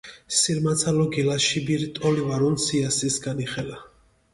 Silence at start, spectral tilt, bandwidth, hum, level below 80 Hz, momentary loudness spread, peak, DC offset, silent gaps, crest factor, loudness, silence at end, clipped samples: 0.05 s; -4 dB/octave; 11.5 kHz; none; -54 dBFS; 8 LU; -8 dBFS; under 0.1%; none; 16 dB; -23 LUFS; 0.45 s; under 0.1%